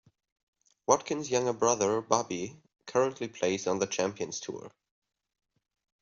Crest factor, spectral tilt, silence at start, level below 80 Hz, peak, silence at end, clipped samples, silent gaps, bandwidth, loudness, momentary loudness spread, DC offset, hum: 24 dB; -4 dB/octave; 0.9 s; -72 dBFS; -8 dBFS; 1.35 s; under 0.1%; none; 7.6 kHz; -30 LUFS; 13 LU; under 0.1%; none